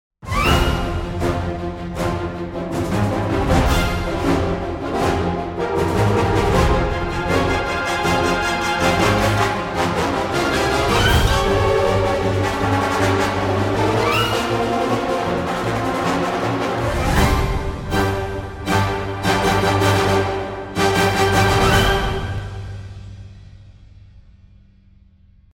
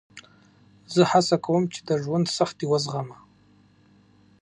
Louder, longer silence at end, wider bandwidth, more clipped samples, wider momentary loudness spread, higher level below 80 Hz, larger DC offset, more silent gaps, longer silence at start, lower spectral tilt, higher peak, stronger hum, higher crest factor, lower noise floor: first, -19 LUFS vs -24 LUFS; about the same, 1.35 s vs 1.3 s; first, 16.5 kHz vs 11 kHz; neither; about the same, 9 LU vs 10 LU; first, -30 dBFS vs -68 dBFS; neither; neither; about the same, 0.2 s vs 0.15 s; about the same, -5 dB/octave vs -5.5 dB/octave; first, -2 dBFS vs -6 dBFS; second, none vs 50 Hz at -60 dBFS; about the same, 18 dB vs 20 dB; second, -50 dBFS vs -58 dBFS